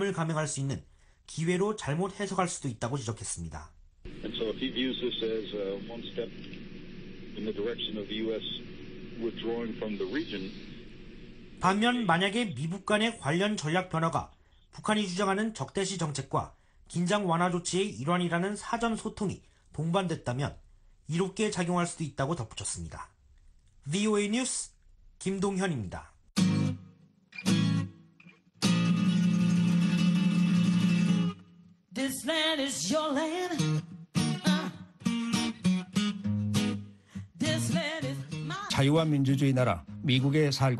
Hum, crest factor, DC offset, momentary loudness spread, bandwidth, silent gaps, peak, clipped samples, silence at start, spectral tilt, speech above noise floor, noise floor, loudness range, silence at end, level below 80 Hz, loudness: none; 20 dB; under 0.1%; 17 LU; 12.5 kHz; none; -10 dBFS; under 0.1%; 0 s; -5 dB/octave; 28 dB; -59 dBFS; 8 LU; 0 s; -56 dBFS; -30 LUFS